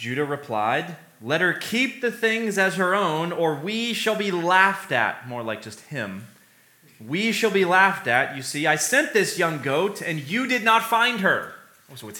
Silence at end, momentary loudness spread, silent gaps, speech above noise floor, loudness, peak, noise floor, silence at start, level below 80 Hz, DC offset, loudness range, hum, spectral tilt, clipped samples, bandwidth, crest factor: 0 s; 13 LU; none; 33 dB; -22 LUFS; -2 dBFS; -56 dBFS; 0 s; -78 dBFS; under 0.1%; 3 LU; none; -3.5 dB/octave; under 0.1%; 19 kHz; 22 dB